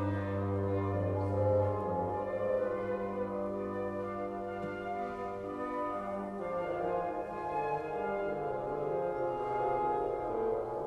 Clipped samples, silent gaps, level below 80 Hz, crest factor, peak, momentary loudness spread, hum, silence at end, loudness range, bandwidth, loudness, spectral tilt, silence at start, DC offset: under 0.1%; none; -60 dBFS; 16 dB; -20 dBFS; 6 LU; none; 0 s; 4 LU; 8.2 kHz; -35 LUFS; -9 dB/octave; 0 s; under 0.1%